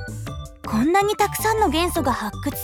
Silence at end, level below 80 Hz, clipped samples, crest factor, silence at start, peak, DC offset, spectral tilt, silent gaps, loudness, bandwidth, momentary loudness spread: 0 s; -38 dBFS; under 0.1%; 16 dB; 0 s; -6 dBFS; under 0.1%; -4.5 dB/octave; none; -21 LUFS; 19 kHz; 14 LU